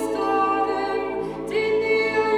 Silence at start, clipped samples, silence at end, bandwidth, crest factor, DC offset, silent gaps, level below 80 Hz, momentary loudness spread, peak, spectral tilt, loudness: 0 s; under 0.1%; 0 s; 13.5 kHz; 12 dB; under 0.1%; none; -54 dBFS; 6 LU; -10 dBFS; -5 dB/octave; -23 LUFS